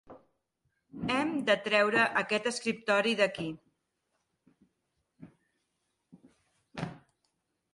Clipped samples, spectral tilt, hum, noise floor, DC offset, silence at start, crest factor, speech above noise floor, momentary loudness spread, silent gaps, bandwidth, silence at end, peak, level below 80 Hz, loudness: under 0.1%; -4 dB/octave; none; -81 dBFS; under 0.1%; 0.1 s; 20 dB; 52 dB; 16 LU; none; 11.5 kHz; 0.75 s; -14 dBFS; -70 dBFS; -29 LUFS